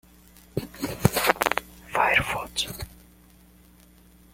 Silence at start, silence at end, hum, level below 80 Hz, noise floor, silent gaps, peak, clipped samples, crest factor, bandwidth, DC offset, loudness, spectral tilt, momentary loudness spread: 0.55 s; 1.45 s; none; -48 dBFS; -54 dBFS; none; 0 dBFS; under 0.1%; 28 dB; 17 kHz; under 0.1%; -25 LUFS; -3.5 dB/octave; 14 LU